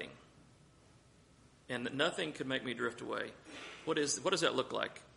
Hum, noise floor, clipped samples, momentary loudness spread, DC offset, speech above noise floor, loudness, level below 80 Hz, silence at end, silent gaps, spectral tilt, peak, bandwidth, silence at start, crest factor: none; -64 dBFS; under 0.1%; 12 LU; under 0.1%; 27 dB; -36 LUFS; -74 dBFS; 0.05 s; none; -3 dB/octave; -16 dBFS; 11.5 kHz; 0 s; 22 dB